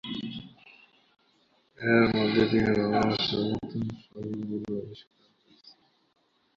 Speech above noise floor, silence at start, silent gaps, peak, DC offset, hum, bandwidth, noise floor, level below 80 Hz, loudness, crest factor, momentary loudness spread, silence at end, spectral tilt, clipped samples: 40 dB; 0.05 s; none; -8 dBFS; under 0.1%; none; 7.2 kHz; -67 dBFS; -56 dBFS; -27 LUFS; 22 dB; 16 LU; 1.55 s; -7 dB/octave; under 0.1%